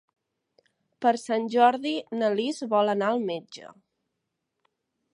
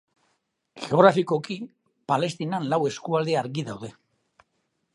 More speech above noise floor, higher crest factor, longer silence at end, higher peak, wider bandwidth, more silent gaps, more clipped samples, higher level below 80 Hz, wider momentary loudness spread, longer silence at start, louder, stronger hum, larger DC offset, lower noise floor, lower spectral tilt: first, 57 dB vs 51 dB; about the same, 20 dB vs 24 dB; first, 1.45 s vs 1.05 s; second, -8 dBFS vs -2 dBFS; about the same, 11 kHz vs 11.5 kHz; neither; neither; second, -84 dBFS vs -72 dBFS; second, 12 LU vs 20 LU; first, 1 s vs 0.75 s; about the same, -25 LUFS vs -24 LUFS; neither; neither; first, -82 dBFS vs -75 dBFS; about the same, -5 dB/octave vs -6 dB/octave